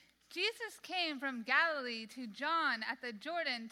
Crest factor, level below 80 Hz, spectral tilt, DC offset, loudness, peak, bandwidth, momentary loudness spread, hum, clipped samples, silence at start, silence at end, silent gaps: 20 dB; -86 dBFS; -2 dB/octave; under 0.1%; -36 LUFS; -18 dBFS; 16.5 kHz; 12 LU; none; under 0.1%; 0.3 s; 0 s; none